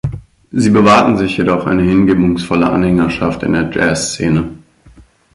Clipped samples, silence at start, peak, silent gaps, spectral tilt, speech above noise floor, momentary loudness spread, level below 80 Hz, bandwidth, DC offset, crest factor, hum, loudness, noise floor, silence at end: under 0.1%; 0.05 s; 0 dBFS; none; -6 dB/octave; 32 dB; 8 LU; -36 dBFS; 11.5 kHz; under 0.1%; 14 dB; none; -13 LUFS; -44 dBFS; 0.35 s